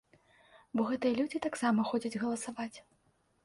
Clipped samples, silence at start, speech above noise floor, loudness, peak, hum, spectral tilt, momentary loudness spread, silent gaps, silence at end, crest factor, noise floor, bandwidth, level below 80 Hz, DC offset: under 0.1%; 0.55 s; 32 dB; -34 LUFS; -18 dBFS; none; -5 dB/octave; 9 LU; none; 0.65 s; 16 dB; -65 dBFS; 11.5 kHz; -72 dBFS; under 0.1%